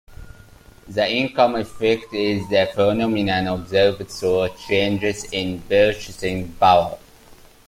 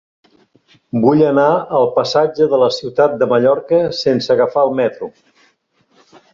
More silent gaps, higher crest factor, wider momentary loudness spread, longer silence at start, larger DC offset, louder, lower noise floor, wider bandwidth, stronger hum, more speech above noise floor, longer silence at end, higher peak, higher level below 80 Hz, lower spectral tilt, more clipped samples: neither; about the same, 18 dB vs 14 dB; about the same, 8 LU vs 6 LU; second, 0.1 s vs 0.95 s; neither; second, -20 LUFS vs -14 LUFS; second, -47 dBFS vs -59 dBFS; first, 16 kHz vs 7.4 kHz; neither; second, 27 dB vs 45 dB; second, 0.35 s vs 1.25 s; about the same, -2 dBFS vs -2 dBFS; first, -46 dBFS vs -58 dBFS; second, -5 dB/octave vs -6.5 dB/octave; neither